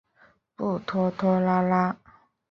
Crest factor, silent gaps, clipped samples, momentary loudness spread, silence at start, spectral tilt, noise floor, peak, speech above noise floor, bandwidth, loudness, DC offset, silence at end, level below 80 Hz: 16 dB; none; under 0.1%; 9 LU; 0.6 s; -9 dB/octave; -61 dBFS; -10 dBFS; 37 dB; 6.2 kHz; -25 LUFS; under 0.1%; 0.55 s; -62 dBFS